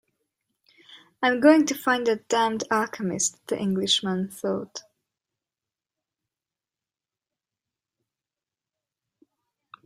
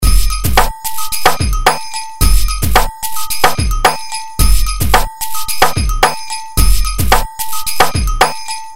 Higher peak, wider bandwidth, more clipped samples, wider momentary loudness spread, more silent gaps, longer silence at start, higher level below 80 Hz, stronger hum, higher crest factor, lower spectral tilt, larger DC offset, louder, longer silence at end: second, -4 dBFS vs 0 dBFS; about the same, 15.5 kHz vs 16.5 kHz; second, under 0.1% vs 0.4%; first, 12 LU vs 7 LU; neither; first, 0.9 s vs 0 s; second, -72 dBFS vs -16 dBFS; neither; first, 22 dB vs 14 dB; about the same, -3.5 dB/octave vs -3 dB/octave; second, under 0.1% vs 10%; second, -23 LUFS vs -14 LUFS; first, 5.05 s vs 0 s